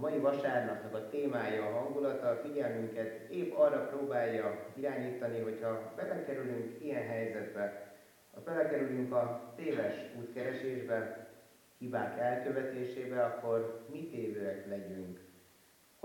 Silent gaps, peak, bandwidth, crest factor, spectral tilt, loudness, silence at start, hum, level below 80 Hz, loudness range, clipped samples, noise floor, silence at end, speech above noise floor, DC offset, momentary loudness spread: none; -18 dBFS; 17 kHz; 20 dB; -7 dB/octave; -37 LUFS; 0 s; none; -86 dBFS; 4 LU; under 0.1%; -65 dBFS; 0.65 s; 29 dB; under 0.1%; 10 LU